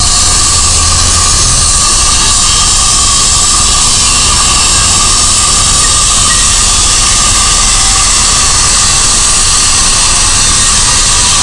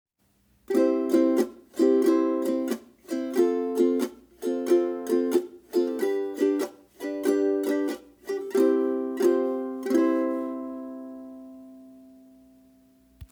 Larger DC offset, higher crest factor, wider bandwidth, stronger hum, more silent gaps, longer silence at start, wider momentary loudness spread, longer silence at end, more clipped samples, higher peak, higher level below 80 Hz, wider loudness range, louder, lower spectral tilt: neither; second, 6 dB vs 16 dB; second, 12 kHz vs over 20 kHz; neither; neither; second, 0 s vs 0.7 s; second, 0 LU vs 13 LU; about the same, 0 s vs 0.05 s; first, 2% vs under 0.1%; first, 0 dBFS vs -10 dBFS; first, -16 dBFS vs -66 dBFS; second, 0 LU vs 5 LU; first, -5 LUFS vs -26 LUFS; second, -0.5 dB/octave vs -5 dB/octave